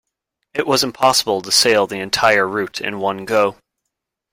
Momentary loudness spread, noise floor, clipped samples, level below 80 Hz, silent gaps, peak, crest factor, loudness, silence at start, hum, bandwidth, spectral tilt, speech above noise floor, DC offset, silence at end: 9 LU; -79 dBFS; under 0.1%; -56 dBFS; none; 0 dBFS; 18 dB; -16 LUFS; 0.55 s; none; 16.5 kHz; -2 dB/octave; 62 dB; under 0.1%; 0.8 s